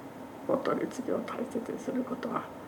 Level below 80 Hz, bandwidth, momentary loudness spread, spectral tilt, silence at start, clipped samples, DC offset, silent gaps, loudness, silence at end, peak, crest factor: -70 dBFS; over 20 kHz; 5 LU; -6 dB/octave; 0 s; under 0.1%; under 0.1%; none; -34 LUFS; 0 s; -14 dBFS; 20 dB